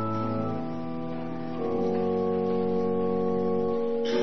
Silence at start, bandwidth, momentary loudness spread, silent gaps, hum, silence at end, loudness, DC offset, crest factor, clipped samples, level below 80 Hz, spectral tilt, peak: 0 s; 6.2 kHz; 7 LU; none; none; 0 s; -28 LUFS; 1%; 12 dB; under 0.1%; -64 dBFS; -8 dB/octave; -16 dBFS